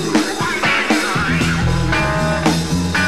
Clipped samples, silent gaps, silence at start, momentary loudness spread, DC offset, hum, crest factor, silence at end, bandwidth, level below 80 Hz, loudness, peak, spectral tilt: under 0.1%; none; 0 s; 2 LU; 1%; none; 16 dB; 0 s; 15 kHz; -30 dBFS; -16 LUFS; -2 dBFS; -4.5 dB/octave